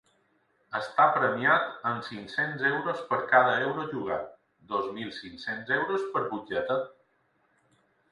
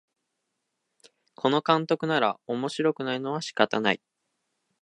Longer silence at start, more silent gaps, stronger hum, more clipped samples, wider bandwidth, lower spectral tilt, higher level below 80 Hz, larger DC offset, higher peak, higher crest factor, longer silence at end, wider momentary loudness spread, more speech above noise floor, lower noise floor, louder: second, 0.7 s vs 1.45 s; neither; neither; neither; about the same, 11 kHz vs 11 kHz; about the same, -6 dB/octave vs -5 dB/octave; first, -70 dBFS vs -78 dBFS; neither; second, -8 dBFS vs -2 dBFS; about the same, 22 dB vs 26 dB; first, 1.2 s vs 0.85 s; first, 13 LU vs 7 LU; second, 42 dB vs 55 dB; second, -70 dBFS vs -80 dBFS; about the same, -28 LUFS vs -26 LUFS